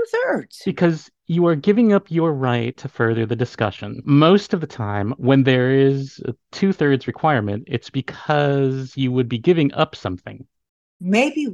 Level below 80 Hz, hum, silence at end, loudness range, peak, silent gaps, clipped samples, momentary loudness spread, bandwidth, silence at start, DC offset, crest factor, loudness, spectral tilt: -60 dBFS; none; 0 s; 3 LU; -2 dBFS; 10.69-11.00 s; under 0.1%; 12 LU; 10 kHz; 0 s; under 0.1%; 18 dB; -19 LUFS; -7.5 dB/octave